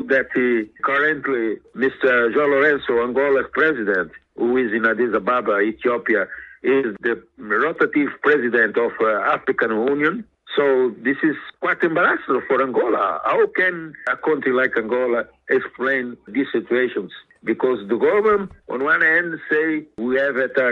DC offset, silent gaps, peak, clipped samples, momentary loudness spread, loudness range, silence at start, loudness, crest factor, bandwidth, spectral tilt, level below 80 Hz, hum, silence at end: under 0.1%; none; -4 dBFS; under 0.1%; 8 LU; 2 LU; 0 s; -19 LUFS; 16 dB; 5.6 kHz; -7 dB/octave; -60 dBFS; none; 0 s